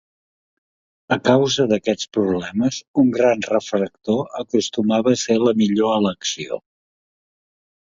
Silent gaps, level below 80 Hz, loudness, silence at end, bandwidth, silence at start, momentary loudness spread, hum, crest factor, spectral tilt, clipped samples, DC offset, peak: 2.88-2.94 s; -58 dBFS; -19 LUFS; 1.25 s; 7.8 kHz; 1.1 s; 7 LU; none; 20 dB; -5 dB/octave; under 0.1%; under 0.1%; 0 dBFS